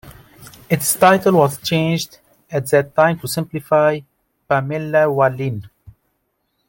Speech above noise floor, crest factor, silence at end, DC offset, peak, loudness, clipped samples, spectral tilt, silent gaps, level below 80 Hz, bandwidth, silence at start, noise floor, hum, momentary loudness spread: 53 dB; 16 dB; 0.8 s; under 0.1%; -2 dBFS; -17 LUFS; under 0.1%; -5 dB/octave; none; -56 dBFS; 17 kHz; 0.05 s; -69 dBFS; none; 12 LU